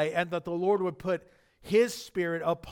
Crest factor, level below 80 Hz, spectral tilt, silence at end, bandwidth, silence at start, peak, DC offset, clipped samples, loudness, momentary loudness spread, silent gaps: 16 dB; -62 dBFS; -5.5 dB/octave; 0 s; 19 kHz; 0 s; -14 dBFS; under 0.1%; under 0.1%; -29 LUFS; 7 LU; none